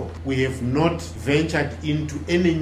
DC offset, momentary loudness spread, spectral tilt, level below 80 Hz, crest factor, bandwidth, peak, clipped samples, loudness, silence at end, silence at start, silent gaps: under 0.1%; 5 LU; -6.5 dB/octave; -40 dBFS; 18 dB; 14.5 kHz; -4 dBFS; under 0.1%; -23 LUFS; 0 s; 0 s; none